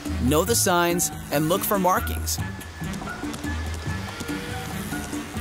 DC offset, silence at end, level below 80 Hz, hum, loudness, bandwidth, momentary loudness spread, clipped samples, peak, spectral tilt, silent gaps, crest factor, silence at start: under 0.1%; 0 s; -38 dBFS; none; -25 LUFS; 16.5 kHz; 12 LU; under 0.1%; -8 dBFS; -4 dB/octave; none; 16 dB; 0 s